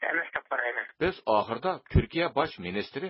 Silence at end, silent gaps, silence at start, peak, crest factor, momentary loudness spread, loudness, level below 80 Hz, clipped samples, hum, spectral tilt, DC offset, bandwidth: 0 s; none; 0 s; -8 dBFS; 20 dB; 5 LU; -29 LUFS; -42 dBFS; under 0.1%; none; -10 dB/octave; under 0.1%; 5.8 kHz